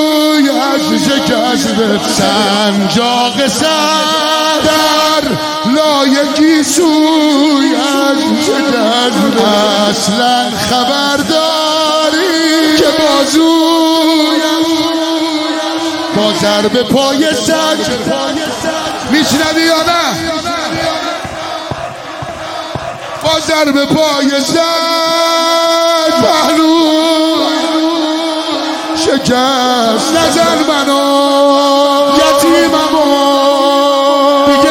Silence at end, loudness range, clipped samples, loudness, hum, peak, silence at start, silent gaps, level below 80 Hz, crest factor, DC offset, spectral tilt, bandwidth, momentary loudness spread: 0 s; 4 LU; under 0.1%; -10 LUFS; none; 0 dBFS; 0 s; none; -44 dBFS; 10 dB; under 0.1%; -3 dB/octave; 17 kHz; 7 LU